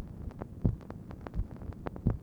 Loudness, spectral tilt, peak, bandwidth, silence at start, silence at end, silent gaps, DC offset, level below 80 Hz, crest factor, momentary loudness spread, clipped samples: -39 LUFS; -10 dB/octave; -12 dBFS; 5.8 kHz; 0 s; 0 s; none; under 0.1%; -42 dBFS; 24 dB; 10 LU; under 0.1%